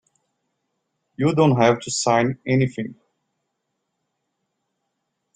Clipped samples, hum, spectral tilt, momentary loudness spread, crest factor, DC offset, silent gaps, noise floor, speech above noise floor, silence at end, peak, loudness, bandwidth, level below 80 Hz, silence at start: under 0.1%; none; -5.5 dB/octave; 9 LU; 22 dB; under 0.1%; none; -77 dBFS; 58 dB; 2.45 s; -2 dBFS; -20 LUFS; 9.6 kHz; -60 dBFS; 1.2 s